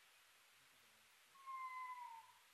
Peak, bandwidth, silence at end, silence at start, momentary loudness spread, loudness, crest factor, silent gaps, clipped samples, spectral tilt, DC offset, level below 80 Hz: -44 dBFS; 13 kHz; 0 s; 0 s; 18 LU; -53 LUFS; 14 dB; none; under 0.1%; 1 dB/octave; under 0.1%; under -90 dBFS